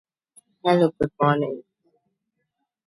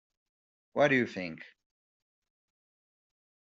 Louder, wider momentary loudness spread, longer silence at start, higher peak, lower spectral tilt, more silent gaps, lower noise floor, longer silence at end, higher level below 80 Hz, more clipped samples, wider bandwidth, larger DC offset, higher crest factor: first, -22 LUFS vs -29 LUFS; second, 10 LU vs 16 LU; about the same, 0.65 s vs 0.75 s; first, -6 dBFS vs -12 dBFS; first, -7.5 dB/octave vs -4 dB/octave; neither; second, -78 dBFS vs under -90 dBFS; second, 1.25 s vs 2 s; first, -58 dBFS vs -78 dBFS; neither; first, 11.5 kHz vs 7.6 kHz; neither; about the same, 20 dB vs 24 dB